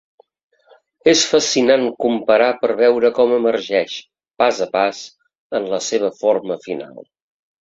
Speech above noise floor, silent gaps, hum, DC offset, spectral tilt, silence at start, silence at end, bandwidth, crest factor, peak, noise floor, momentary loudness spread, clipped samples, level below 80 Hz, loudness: 37 dB; 5.38-5.50 s; none; under 0.1%; -2.5 dB/octave; 1.05 s; 0.65 s; 7.8 kHz; 18 dB; 0 dBFS; -53 dBFS; 13 LU; under 0.1%; -62 dBFS; -17 LUFS